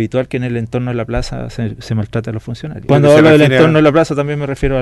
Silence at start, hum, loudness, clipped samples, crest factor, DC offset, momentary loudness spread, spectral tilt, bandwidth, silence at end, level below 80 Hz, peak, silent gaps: 0 s; none; -13 LUFS; under 0.1%; 12 dB; under 0.1%; 16 LU; -7 dB/octave; 12 kHz; 0 s; -30 dBFS; 0 dBFS; none